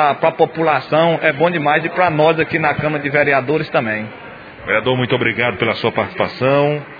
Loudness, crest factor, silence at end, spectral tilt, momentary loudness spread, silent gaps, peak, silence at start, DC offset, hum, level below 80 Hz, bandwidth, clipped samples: -16 LUFS; 16 dB; 0 s; -8.5 dB/octave; 6 LU; none; 0 dBFS; 0 s; under 0.1%; none; -52 dBFS; 5 kHz; under 0.1%